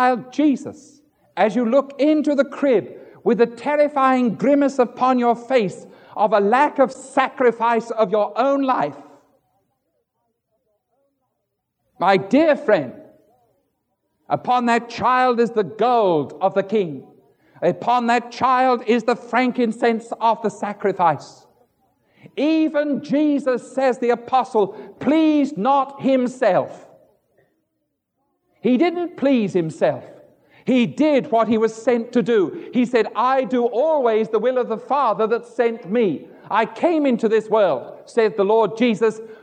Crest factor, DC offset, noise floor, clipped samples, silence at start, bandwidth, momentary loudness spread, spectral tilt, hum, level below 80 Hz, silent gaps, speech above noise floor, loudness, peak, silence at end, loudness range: 18 dB; under 0.1%; -76 dBFS; under 0.1%; 0 s; 9.4 kHz; 6 LU; -6 dB/octave; none; -70 dBFS; none; 57 dB; -19 LUFS; -2 dBFS; 0.05 s; 4 LU